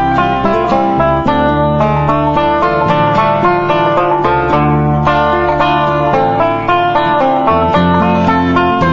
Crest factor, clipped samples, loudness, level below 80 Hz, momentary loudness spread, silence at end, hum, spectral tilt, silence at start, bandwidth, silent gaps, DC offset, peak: 10 dB; under 0.1%; -11 LUFS; -30 dBFS; 1 LU; 0 s; none; -8 dB/octave; 0 s; 7.4 kHz; none; under 0.1%; 0 dBFS